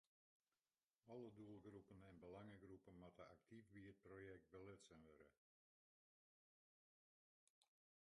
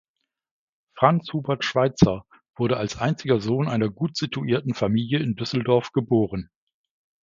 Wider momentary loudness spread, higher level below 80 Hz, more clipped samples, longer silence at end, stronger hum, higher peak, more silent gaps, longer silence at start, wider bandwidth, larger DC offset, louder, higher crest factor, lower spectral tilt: about the same, 6 LU vs 7 LU; second, -84 dBFS vs -50 dBFS; neither; second, 0.45 s vs 0.8 s; neither; second, -48 dBFS vs 0 dBFS; first, 5.38-7.62 s vs none; about the same, 1.05 s vs 0.95 s; first, 9.6 kHz vs 7.6 kHz; neither; second, -64 LUFS vs -23 LUFS; second, 18 dB vs 24 dB; about the same, -6.5 dB/octave vs -6.5 dB/octave